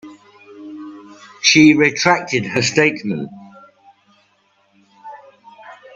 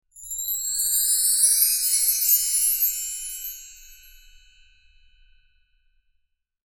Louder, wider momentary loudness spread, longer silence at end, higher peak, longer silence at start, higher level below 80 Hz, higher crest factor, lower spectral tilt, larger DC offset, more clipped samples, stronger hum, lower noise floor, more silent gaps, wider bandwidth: first, -14 LUFS vs -19 LUFS; first, 26 LU vs 15 LU; second, 0.2 s vs 2.75 s; first, 0 dBFS vs -6 dBFS; about the same, 0.05 s vs 0.15 s; about the same, -60 dBFS vs -56 dBFS; about the same, 20 dB vs 20 dB; first, -3.5 dB/octave vs 7 dB/octave; neither; neither; neither; second, -60 dBFS vs -72 dBFS; neither; second, 7.8 kHz vs 19 kHz